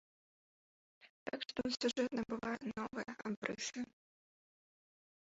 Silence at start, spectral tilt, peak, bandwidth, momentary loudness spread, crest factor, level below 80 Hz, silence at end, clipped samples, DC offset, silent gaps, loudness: 1 s; -2.5 dB/octave; -20 dBFS; 7.6 kHz; 10 LU; 24 dB; -76 dBFS; 1.45 s; under 0.1%; under 0.1%; 1.10-1.26 s, 3.37-3.42 s; -42 LUFS